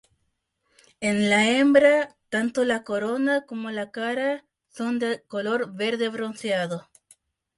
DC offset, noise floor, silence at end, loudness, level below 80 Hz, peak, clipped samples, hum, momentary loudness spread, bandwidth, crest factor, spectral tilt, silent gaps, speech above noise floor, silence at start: under 0.1%; -75 dBFS; 0.8 s; -24 LUFS; -68 dBFS; -6 dBFS; under 0.1%; none; 13 LU; 11.5 kHz; 20 dB; -4.5 dB/octave; none; 52 dB; 1 s